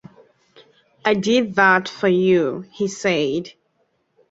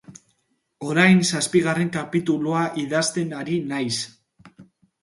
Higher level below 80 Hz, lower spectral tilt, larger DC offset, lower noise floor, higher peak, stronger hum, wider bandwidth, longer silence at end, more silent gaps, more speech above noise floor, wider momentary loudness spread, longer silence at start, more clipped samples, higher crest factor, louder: about the same, -62 dBFS vs -66 dBFS; about the same, -5 dB/octave vs -4.5 dB/octave; neither; second, -67 dBFS vs -71 dBFS; about the same, -2 dBFS vs -2 dBFS; neither; second, 8 kHz vs 11.5 kHz; first, 0.8 s vs 0.4 s; neither; about the same, 49 dB vs 49 dB; about the same, 11 LU vs 11 LU; first, 1.05 s vs 0.1 s; neither; about the same, 20 dB vs 20 dB; about the same, -19 LUFS vs -21 LUFS